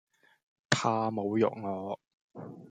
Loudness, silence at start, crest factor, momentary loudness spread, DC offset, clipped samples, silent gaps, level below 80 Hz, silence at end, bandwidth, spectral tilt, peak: -31 LUFS; 0.7 s; 26 dB; 18 LU; under 0.1%; under 0.1%; 2.13-2.30 s; -74 dBFS; 0 s; 9.6 kHz; -5 dB/octave; -8 dBFS